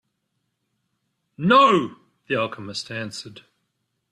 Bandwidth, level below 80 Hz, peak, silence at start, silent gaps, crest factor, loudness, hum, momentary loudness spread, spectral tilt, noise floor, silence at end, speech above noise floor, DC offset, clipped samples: 11.5 kHz; -66 dBFS; -4 dBFS; 1.4 s; none; 20 dB; -20 LUFS; none; 19 LU; -5 dB/octave; -76 dBFS; 0.8 s; 55 dB; under 0.1%; under 0.1%